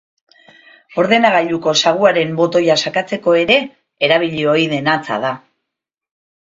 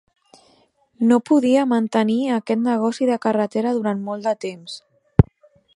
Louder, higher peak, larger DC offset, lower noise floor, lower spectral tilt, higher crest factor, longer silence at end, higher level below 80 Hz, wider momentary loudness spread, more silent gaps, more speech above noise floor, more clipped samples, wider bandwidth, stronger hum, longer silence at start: first, -15 LUFS vs -20 LUFS; about the same, 0 dBFS vs 0 dBFS; neither; first, -81 dBFS vs -59 dBFS; second, -4 dB/octave vs -7.5 dB/octave; about the same, 16 dB vs 20 dB; first, 1.2 s vs 0.55 s; second, -58 dBFS vs -40 dBFS; about the same, 9 LU vs 10 LU; neither; first, 66 dB vs 40 dB; neither; second, 7.8 kHz vs 11.5 kHz; neither; about the same, 0.95 s vs 1 s